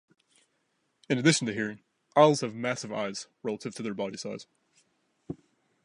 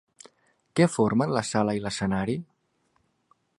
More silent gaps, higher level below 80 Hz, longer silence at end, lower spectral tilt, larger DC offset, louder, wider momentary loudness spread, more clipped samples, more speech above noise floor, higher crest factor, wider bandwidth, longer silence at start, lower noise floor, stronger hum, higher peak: neither; second, -72 dBFS vs -56 dBFS; second, 0.5 s vs 1.15 s; second, -4.5 dB/octave vs -6 dB/octave; neither; about the same, -28 LUFS vs -26 LUFS; first, 22 LU vs 9 LU; neither; about the same, 47 dB vs 46 dB; about the same, 24 dB vs 22 dB; about the same, 11.5 kHz vs 11.5 kHz; first, 1.1 s vs 0.75 s; first, -75 dBFS vs -71 dBFS; neither; about the same, -6 dBFS vs -6 dBFS